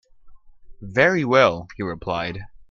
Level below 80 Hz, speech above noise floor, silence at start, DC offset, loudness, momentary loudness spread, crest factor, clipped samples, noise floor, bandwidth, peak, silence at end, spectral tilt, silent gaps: -50 dBFS; 23 dB; 0.25 s; under 0.1%; -20 LUFS; 14 LU; 22 dB; under 0.1%; -44 dBFS; 7.2 kHz; 0 dBFS; 0.1 s; -6 dB/octave; none